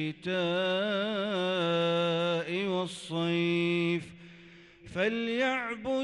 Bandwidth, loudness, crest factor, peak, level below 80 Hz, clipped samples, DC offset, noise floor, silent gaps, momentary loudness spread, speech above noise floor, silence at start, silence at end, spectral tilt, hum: 11 kHz; -30 LUFS; 12 dB; -18 dBFS; -68 dBFS; under 0.1%; under 0.1%; -54 dBFS; none; 5 LU; 24 dB; 0 s; 0 s; -6 dB/octave; none